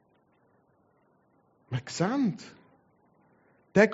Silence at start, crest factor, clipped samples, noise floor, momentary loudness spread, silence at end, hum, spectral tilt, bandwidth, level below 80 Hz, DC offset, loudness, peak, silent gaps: 1.7 s; 24 dB; under 0.1%; -67 dBFS; 17 LU; 0 s; none; -5.5 dB/octave; 8 kHz; -70 dBFS; under 0.1%; -30 LUFS; -8 dBFS; none